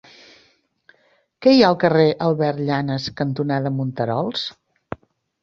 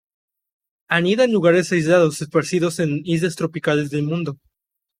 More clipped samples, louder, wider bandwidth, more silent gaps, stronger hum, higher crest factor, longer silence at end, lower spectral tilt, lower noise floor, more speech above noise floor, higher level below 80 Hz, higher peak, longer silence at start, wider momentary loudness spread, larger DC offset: neither; about the same, -19 LUFS vs -19 LUFS; second, 7.2 kHz vs 15 kHz; neither; neither; about the same, 20 dB vs 18 dB; first, 0.9 s vs 0.65 s; first, -7 dB/octave vs -5.5 dB/octave; second, -61 dBFS vs -82 dBFS; second, 43 dB vs 64 dB; about the same, -58 dBFS vs -62 dBFS; about the same, -2 dBFS vs -2 dBFS; first, 1.4 s vs 0.9 s; first, 18 LU vs 7 LU; neither